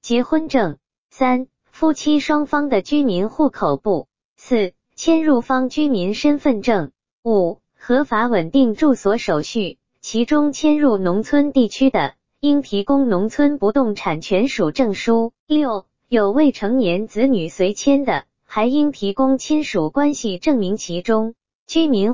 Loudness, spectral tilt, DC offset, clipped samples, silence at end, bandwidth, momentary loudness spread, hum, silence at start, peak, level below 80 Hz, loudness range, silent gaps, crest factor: -18 LUFS; -5.5 dB/octave; 2%; under 0.1%; 0 s; 7.6 kHz; 7 LU; none; 0 s; -4 dBFS; -50 dBFS; 2 LU; 0.98-1.09 s, 4.25-4.36 s, 7.12-7.23 s, 15.39-15.47 s, 21.55-21.66 s; 14 dB